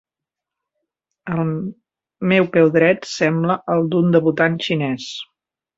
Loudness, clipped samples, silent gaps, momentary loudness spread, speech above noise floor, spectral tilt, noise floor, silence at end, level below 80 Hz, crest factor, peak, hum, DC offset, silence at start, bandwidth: -18 LUFS; under 0.1%; none; 16 LU; 69 dB; -6.5 dB/octave; -86 dBFS; 0.55 s; -60 dBFS; 18 dB; -2 dBFS; none; under 0.1%; 1.25 s; 7.8 kHz